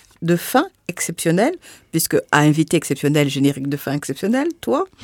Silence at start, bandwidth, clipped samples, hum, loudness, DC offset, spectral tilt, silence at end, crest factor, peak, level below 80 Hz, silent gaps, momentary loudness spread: 0.2 s; 19 kHz; under 0.1%; none; -19 LUFS; under 0.1%; -5 dB/octave; 0.2 s; 18 dB; 0 dBFS; -60 dBFS; none; 9 LU